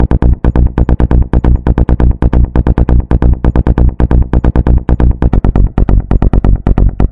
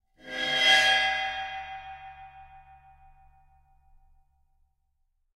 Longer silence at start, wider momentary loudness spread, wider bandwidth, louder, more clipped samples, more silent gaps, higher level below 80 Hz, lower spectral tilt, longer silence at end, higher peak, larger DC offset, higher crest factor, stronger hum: second, 0 s vs 0.25 s; second, 1 LU vs 25 LU; second, 3.6 kHz vs 16 kHz; first, -11 LUFS vs -23 LUFS; neither; neither; first, -10 dBFS vs -60 dBFS; first, -11 dB/octave vs 0 dB/octave; second, 0 s vs 2.8 s; first, 0 dBFS vs -8 dBFS; first, 2% vs under 0.1%; second, 8 dB vs 22 dB; neither